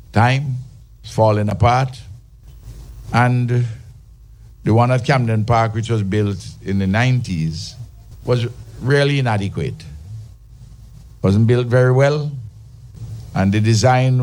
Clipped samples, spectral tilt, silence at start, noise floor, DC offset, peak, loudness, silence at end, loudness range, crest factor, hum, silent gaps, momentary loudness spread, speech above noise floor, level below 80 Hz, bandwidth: under 0.1%; -7 dB/octave; 0.15 s; -42 dBFS; under 0.1%; -2 dBFS; -17 LUFS; 0 s; 3 LU; 16 dB; none; none; 20 LU; 26 dB; -42 dBFS; 11 kHz